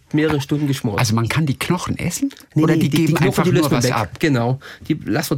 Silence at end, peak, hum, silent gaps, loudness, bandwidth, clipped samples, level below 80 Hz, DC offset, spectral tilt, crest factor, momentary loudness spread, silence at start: 0 s; -6 dBFS; none; none; -18 LUFS; 17 kHz; under 0.1%; -46 dBFS; under 0.1%; -5.5 dB/octave; 12 dB; 7 LU; 0.15 s